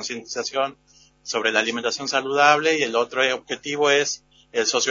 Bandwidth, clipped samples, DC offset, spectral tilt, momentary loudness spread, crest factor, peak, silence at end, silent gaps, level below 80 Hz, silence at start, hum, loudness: 7.6 kHz; under 0.1%; under 0.1%; -1.5 dB/octave; 11 LU; 20 dB; -2 dBFS; 0 s; none; -68 dBFS; 0 s; none; -21 LUFS